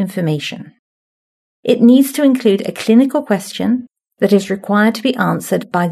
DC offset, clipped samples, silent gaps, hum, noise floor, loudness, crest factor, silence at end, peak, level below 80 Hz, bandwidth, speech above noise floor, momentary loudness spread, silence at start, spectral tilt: under 0.1%; under 0.1%; 0.79-1.63 s; none; under -90 dBFS; -14 LUFS; 14 dB; 0 s; 0 dBFS; -66 dBFS; 13.5 kHz; over 76 dB; 10 LU; 0 s; -6 dB/octave